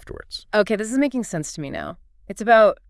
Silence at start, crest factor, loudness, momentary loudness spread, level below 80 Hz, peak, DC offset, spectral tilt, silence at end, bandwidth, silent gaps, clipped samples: 0.05 s; 20 dB; -21 LUFS; 19 LU; -50 dBFS; -2 dBFS; under 0.1%; -4.5 dB/octave; 0.15 s; 12 kHz; none; under 0.1%